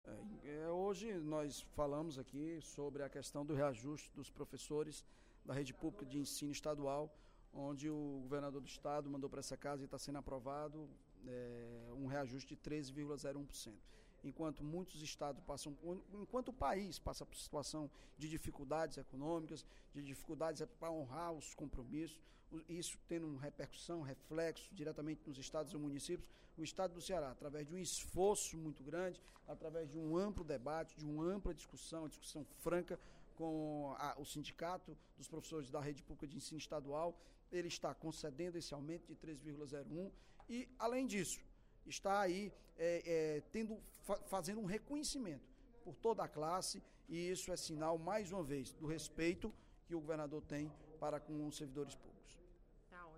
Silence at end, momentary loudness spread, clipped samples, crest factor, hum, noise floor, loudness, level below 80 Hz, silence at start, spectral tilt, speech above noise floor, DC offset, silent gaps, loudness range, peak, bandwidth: 0 s; 11 LU; under 0.1%; 20 dB; none; -66 dBFS; -46 LUFS; -64 dBFS; 0.05 s; -4.5 dB/octave; 20 dB; under 0.1%; none; 5 LU; -26 dBFS; 16 kHz